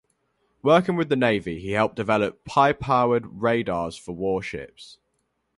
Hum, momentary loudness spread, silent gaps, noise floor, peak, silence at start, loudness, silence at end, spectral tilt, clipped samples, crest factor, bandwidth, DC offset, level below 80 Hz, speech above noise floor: none; 10 LU; none; -73 dBFS; -4 dBFS; 0.65 s; -23 LUFS; 0.7 s; -6.5 dB/octave; under 0.1%; 20 dB; 11.5 kHz; under 0.1%; -54 dBFS; 51 dB